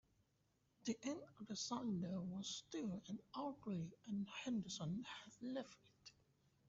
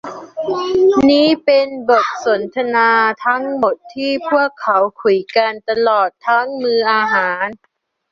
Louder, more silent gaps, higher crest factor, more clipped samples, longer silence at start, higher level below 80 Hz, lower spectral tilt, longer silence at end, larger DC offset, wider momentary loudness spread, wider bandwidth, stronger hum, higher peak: second, -48 LUFS vs -15 LUFS; neither; about the same, 16 dB vs 14 dB; neither; first, 0.85 s vs 0.05 s; second, -80 dBFS vs -56 dBFS; about the same, -5 dB/octave vs -4.5 dB/octave; about the same, 0.6 s vs 0.55 s; neither; about the same, 9 LU vs 8 LU; about the same, 8 kHz vs 7.4 kHz; neither; second, -32 dBFS vs -2 dBFS